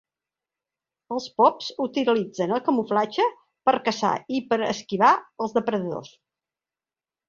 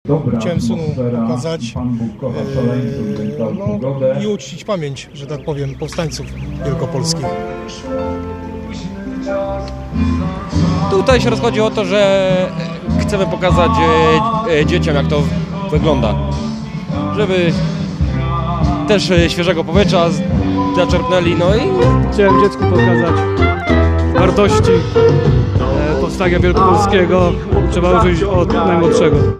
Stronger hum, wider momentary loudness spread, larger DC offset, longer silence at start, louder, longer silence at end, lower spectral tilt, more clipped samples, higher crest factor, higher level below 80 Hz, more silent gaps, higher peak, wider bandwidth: neither; about the same, 9 LU vs 11 LU; neither; first, 1.1 s vs 0.05 s; second, -24 LUFS vs -15 LUFS; first, 1.2 s vs 0 s; second, -5 dB/octave vs -6.5 dB/octave; neither; first, 20 dB vs 14 dB; second, -70 dBFS vs -26 dBFS; neither; second, -4 dBFS vs 0 dBFS; second, 7.6 kHz vs 12 kHz